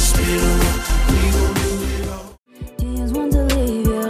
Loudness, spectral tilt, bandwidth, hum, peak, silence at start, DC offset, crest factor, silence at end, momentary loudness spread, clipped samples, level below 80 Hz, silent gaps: -19 LUFS; -5 dB/octave; 16 kHz; none; -4 dBFS; 0 s; under 0.1%; 12 dB; 0 s; 11 LU; under 0.1%; -20 dBFS; 2.38-2.43 s